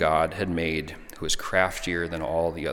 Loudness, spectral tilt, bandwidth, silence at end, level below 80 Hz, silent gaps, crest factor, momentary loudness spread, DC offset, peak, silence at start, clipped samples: -27 LUFS; -4 dB/octave; 17.5 kHz; 0 s; -44 dBFS; none; 20 dB; 7 LU; under 0.1%; -6 dBFS; 0 s; under 0.1%